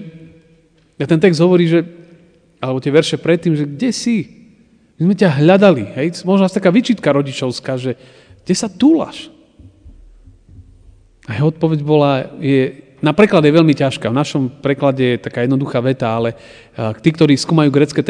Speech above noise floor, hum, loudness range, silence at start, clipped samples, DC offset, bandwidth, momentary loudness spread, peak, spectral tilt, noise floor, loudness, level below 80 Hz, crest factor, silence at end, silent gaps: 38 dB; none; 6 LU; 0 s; under 0.1%; under 0.1%; 10 kHz; 11 LU; 0 dBFS; -6.5 dB/octave; -52 dBFS; -15 LUFS; -52 dBFS; 16 dB; 0 s; none